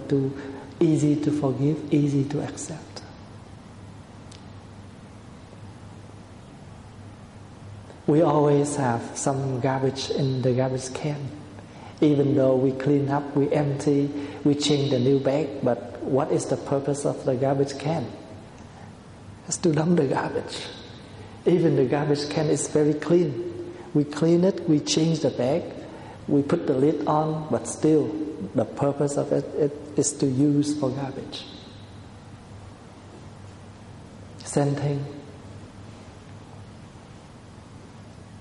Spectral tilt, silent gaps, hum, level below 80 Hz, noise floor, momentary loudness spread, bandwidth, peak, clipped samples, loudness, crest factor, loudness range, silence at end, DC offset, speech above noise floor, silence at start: -6 dB/octave; none; none; -56 dBFS; -45 dBFS; 23 LU; 11.5 kHz; -8 dBFS; under 0.1%; -24 LUFS; 18 dB; 17 LU; 0 s; under 0.1%; 22 dB; 0 s